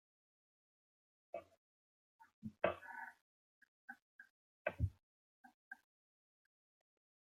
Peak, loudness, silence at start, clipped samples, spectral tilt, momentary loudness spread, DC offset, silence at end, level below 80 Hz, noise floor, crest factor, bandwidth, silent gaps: -22 dBFS; -46 LUFS; 1.35 s; under 0.1%; -8 dB/octave; 21 LU; under 0.1%; 1.65 s; -66 dBFS; under -90 dBFS; 30 dB; 14.5 kHz; 1.57-2.19 s, 2.33-2.42 s, 3.21-3.61 s, 3.68-3.88 s, 4.02-4.19 s, 4.30-4.65 s, 5.03-5.44 s, 5.54-5.71 s